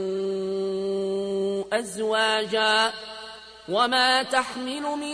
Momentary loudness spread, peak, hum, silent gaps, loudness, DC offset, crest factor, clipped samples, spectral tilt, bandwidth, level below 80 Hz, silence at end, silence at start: 12 LU; -8 dBFS; none; none; -24 LUFS; under 0.1%; 18 dB; under 0.1%; -3 dB/octave; 11 kHz; -64 dBFS; 0 s; 0 s